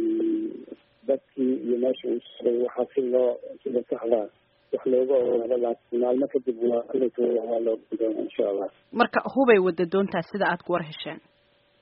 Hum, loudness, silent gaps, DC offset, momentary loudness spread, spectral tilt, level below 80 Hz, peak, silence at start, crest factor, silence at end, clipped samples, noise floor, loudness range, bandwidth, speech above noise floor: none; -26 LUFS; none; under 0.1%; 10 LU; -4.5 dB/octave; -70 dBFS; -6 dBFS; 0 s; 20 dB; 0.65 s; under 0.1%; -64 dBFS; 3 LU; 5.4 kHz; 39 dB